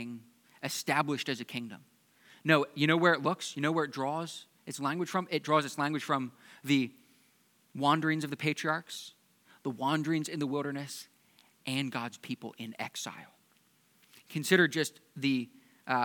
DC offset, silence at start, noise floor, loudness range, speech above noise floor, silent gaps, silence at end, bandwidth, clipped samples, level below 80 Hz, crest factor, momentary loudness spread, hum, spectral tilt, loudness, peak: under 0.1%; 0 s; -68 dBFS; 7 LU; 36 dB; none; 0 s; 19 kHz; under 0.1%; -88 dBFS; 26 dB; 17 LU; none; -4.5 dB/octave; -32 LUFS; -8 dBFS